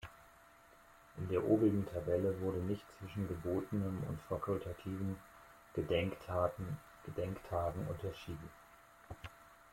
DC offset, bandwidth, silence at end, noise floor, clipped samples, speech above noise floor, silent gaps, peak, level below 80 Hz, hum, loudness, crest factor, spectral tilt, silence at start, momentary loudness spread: under 0.1%; 16.5 kHz; 0.05 s; -63 dBFS; under 0.1%; 25 dB; none; -20 dBFS; -62 dBFS; none; -39 LUFS; 20 dB; -8 dB/octave; 0 s; 18 LU